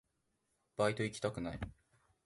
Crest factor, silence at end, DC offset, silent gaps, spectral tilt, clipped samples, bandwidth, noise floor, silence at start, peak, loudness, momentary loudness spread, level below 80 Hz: 20 dB; 0.55 s; under 0.1%; none; -5.5 dB/octave; under 0.1%; 11.5 kHz; -82 dBFS; 0.8 s; -20 dBFS; -38 LUFS; 14 LU; -60 dBFS